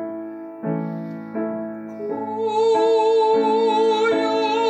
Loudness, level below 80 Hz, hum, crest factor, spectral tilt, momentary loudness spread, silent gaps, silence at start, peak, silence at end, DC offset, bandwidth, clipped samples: -20 LUFS; -78 dBFS; none; 12 dB; -6 dB/octave; 14 LU; none; 0 s; -8 dBFS; 0 s; under 0.1%; 8.6 kHz; under 0.1%